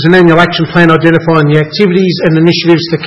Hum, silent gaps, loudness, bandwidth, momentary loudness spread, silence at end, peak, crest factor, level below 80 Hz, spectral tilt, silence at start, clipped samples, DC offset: none; none; -7 LUFS; 7.6 kHz; 4 LU; 0 s; 0 dBFS; 8 dB; -40 dBFS; -7.5 dB/octave; 0 s; 2%; under 0.1%